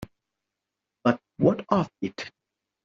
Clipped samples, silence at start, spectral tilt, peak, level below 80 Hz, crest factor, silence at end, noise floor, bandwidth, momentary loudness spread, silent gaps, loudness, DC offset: under 0.1%; 0 s; -6.5 dB/octave; -6 dBFS; -62 dBFS; 22 dB; 0.55 s; -86 dBFS; 7.6 kHz; 16 LU; none; -26 LUFS; under 0.1%